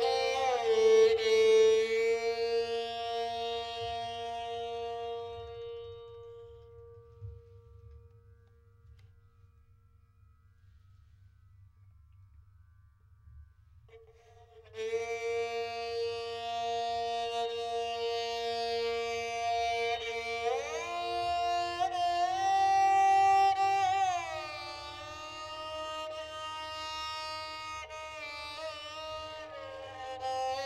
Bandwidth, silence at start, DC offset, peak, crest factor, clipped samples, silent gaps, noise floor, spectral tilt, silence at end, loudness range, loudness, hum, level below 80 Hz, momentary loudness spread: 12.5 kHz; 0 s; under 0.1%; -16 dBFS; 18 dB; under 0.1%; none; -63 dBFS; -2.5 dB/octave; 0 s; 15 LU; -32 LUFS; none; -62 dBFS; 18 LU